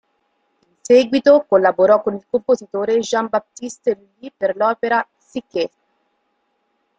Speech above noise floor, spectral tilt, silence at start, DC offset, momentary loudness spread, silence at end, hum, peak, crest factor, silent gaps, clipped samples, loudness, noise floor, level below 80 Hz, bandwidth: 51 dB; -4.5 dB/octave; 0.9 s; under 0.1%; 14 LU; 1.3 s; none; -2 dBFS; 16 dB; none; under 0.1%; -17 LUFS; -68 dBFS; -64 dBFS; 9 kHz